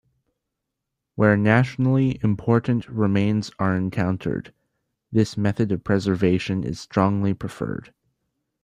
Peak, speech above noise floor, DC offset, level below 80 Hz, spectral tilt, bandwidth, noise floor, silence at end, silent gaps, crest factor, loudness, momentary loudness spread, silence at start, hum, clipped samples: -4 dBFS; 61 dB; under 0.1%; -52 dBFS; -7.5 dB/octave; 10.5 kHz; -82 dBFS; 0.85 s; none; 20 dB; -22 LUFS; 10 LU; 1.15 s; none; under 0.1%